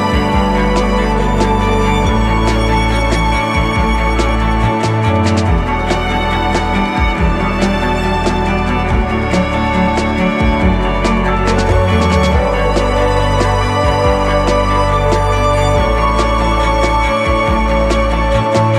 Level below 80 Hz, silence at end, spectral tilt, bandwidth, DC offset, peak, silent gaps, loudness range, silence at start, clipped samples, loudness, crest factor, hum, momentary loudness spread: -18 dBFS; 0 s; -6 dB/octave; 12 kHz; under 0.1%; 0 dBFS; none; 2 LU; 0 s; under 0.1%; -13 LUFS; 12 dB; none; 2 LU